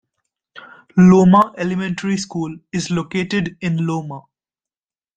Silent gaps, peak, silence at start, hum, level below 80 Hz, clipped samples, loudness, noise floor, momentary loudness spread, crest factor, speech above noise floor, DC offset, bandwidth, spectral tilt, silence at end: none; -2 dBFS; 0.55 s; none; -54 dBFS; under 0.1%; -17 LUFS; under -90 dBFS; 15 LU; 16 dB; over 74 dB; under 0.1%; 8.8 kHz; -7 dB/octave; 0.95 s